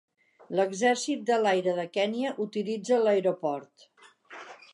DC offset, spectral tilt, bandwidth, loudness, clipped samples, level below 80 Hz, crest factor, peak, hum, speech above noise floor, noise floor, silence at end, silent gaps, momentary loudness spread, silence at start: under 0.1%; -4.5 dB/octave; 11.5 kHz; -28 LUFS; under 0.1%; -84 dBFS; 16 dB; -12 dBFS; none; 22 dB; -50 dBFS; 0.2 s; none; 16 LU; 0.5 s